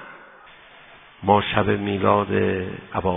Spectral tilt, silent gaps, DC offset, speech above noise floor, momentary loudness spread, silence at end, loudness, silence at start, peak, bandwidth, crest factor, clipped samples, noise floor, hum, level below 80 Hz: -10.5 dB/octave; none; under 0.1%; 27 dB; 10 LU; 0 s; -21 LUFS; 0 s; -2 dBFS; 3.8 kHz; 22 dB; under 0.1%; -47 dBFS; none; -50 dBFS